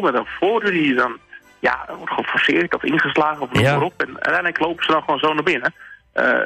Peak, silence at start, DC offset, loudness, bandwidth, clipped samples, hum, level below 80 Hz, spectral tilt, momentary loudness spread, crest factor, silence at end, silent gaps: -6 dBFS; 0 s; under 0.1%; -19 LUFS; 14 kHz; under 0.1%; none; -54 dBFS; -6 dB/octave; 7 LU; 14 dB; 0 s; none